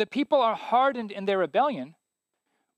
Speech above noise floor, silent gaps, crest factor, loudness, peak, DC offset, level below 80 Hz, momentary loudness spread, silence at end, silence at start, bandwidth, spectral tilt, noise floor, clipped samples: 57 dB; none; 16 dB; -25 LUFS; -10 dBFS; under 0.1%; -82 dBFS; 9 LU; 0.85 s; 0 s; 9.4 kHz; -6 dB/octave; -83 dBFS; under 0.1%